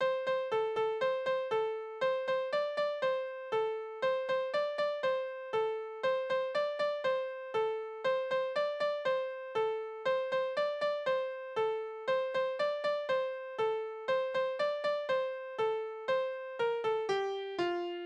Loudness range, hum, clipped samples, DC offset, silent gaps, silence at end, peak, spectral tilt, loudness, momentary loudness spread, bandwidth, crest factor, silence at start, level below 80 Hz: 1 LU; none; under 0.1%; under 0.1%; none; 0 s; -22 dBFS; -4 dB/octave; -34 LUFS; 4 LU; 8.4 kHz; 12 dB; 0 s; -78 dBFS